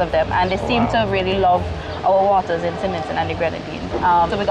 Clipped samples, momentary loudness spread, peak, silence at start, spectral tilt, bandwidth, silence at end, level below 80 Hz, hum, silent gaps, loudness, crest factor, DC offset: under 0.1%; 7 LU; -8 dBFS; 0 s; -6.5 dB/octave; 10 kHz; 0 s; -36 dBFS; none; none; -19 LUFS; 10 dB; under 0.1%